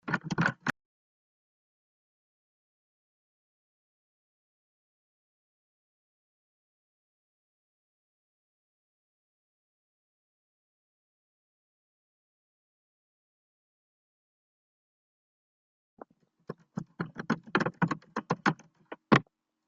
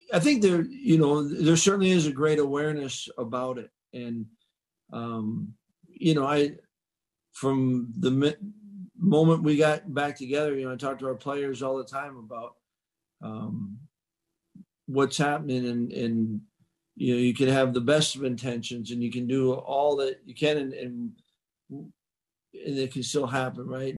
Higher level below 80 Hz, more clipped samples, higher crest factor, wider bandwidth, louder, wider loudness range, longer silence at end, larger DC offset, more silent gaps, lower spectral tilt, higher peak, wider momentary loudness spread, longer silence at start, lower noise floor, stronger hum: about the same, -70 dBFS vs -68 dBFS; neither; first, 30 dB vs 20 dB; second, 7.4 kHz vs 12 kHz; second, -31 LUFS vs -26 LUFS; first, 19 LU vs 9 LU; first, 0.45 s vs 0 s; neither; first, 0.85-15.97 s vs none; about the same, -4.5 dB/octave vs -5.5 dB/octave; about the same, -8 dBFS vs -8 dBFS; about the same, 19 LU vs 18 LU; about the same, 0.05 s vs 0.1 s; second, -55 dBFS vs under -90 dBFS; neither